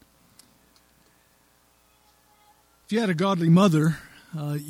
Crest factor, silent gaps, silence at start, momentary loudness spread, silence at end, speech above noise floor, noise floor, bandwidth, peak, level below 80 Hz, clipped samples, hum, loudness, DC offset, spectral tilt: 20 dB; none; 2.9 s; 17 LU; 0 s; 41 dB; -62 dBFS; 15 kHz; -6 dBFS; -64 dBFS; under 0.1%; none; -22 LUFS; under 0.1%; -7 dB/octave